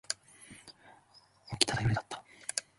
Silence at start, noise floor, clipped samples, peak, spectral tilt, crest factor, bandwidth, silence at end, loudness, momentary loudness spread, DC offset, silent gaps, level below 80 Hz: 0.1 s; -63 dBFS; under 0.1%; -4 dBFS; -3 dB/octave; 34 dB; 12 kHz; 0.15 s; -33 LUFS; 23 LU; under 0.1%; none; -56 dBFS